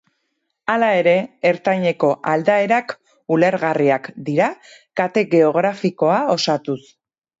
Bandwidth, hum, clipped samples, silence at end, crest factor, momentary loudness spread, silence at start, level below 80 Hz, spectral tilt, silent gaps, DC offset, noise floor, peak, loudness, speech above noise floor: 7.8 kHz; none; under 0.1%; 0.6 s; 16 dB; 8 LU; 0.7 s; -68 dBFS; -6 dB/octave; none; under 0.1%; -73 dBFS; -2 dBFS; -18 LUFS; 55 dB